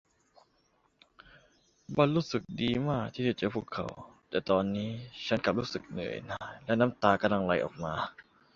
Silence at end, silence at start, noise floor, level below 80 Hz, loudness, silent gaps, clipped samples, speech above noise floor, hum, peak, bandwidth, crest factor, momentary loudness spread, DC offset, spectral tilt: 0.35 s; 1.9 s; -71 dBFS; -60 dBFS; -31 LUFS; none; under 0.1%; 40 dB; none; -8 dBFS; 7.6 kHz; 24 dB; 12 LU; under 0.1%; -6.5 dB/octave